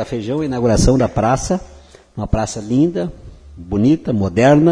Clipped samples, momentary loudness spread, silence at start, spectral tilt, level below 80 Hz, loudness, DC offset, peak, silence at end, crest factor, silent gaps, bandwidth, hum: under 0.1%; 10 LU; 0 s; -6.5 dB/octave; -30 dBFS; -17 LUFS; under 0.1%; 0 dBFS; 0 s; 16 dB; none; 10.5 kHz; none